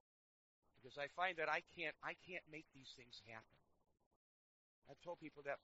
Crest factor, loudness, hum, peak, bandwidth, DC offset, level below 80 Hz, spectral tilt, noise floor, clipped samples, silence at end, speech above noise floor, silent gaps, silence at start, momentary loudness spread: 26 dB; -48 LUFS; none; -26 dBFS; 7.6 kHz; under 0.1%; -84 dBFS; -1 dB/octave; under -90 dBFS; under 0.1%; 0.05 s; over 41 dB; 4.06-4.82 s; 0.75 s; 17 LU